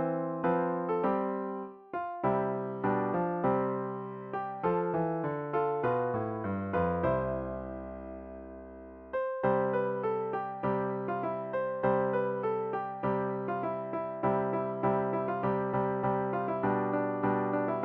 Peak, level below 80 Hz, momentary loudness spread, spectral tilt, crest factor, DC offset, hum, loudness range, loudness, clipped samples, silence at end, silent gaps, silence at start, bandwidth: -16 dBFS; -58 dBFS; 9 LU; -7.5 dB/octave; 16 dB; under 0.1%; none; 3 LU; -32 LUFS; under 0.1%; 0 s; none; 0 s; 4.6 kHz